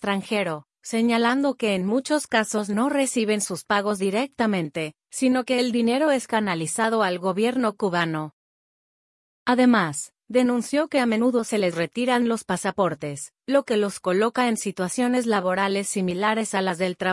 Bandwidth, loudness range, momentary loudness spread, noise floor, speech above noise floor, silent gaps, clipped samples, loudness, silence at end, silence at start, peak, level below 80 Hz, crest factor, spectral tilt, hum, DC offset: 12 kHz; 1 LU; 6 LU; under -90 dBFS; over 67 dB; 8.33-9.46 s; under 0.1%; -23 LUFS; 0 s; 0 s; -8 dBFS; -68 dBFS; 16 dB; -4.5 dB/octave; none; under 0.1%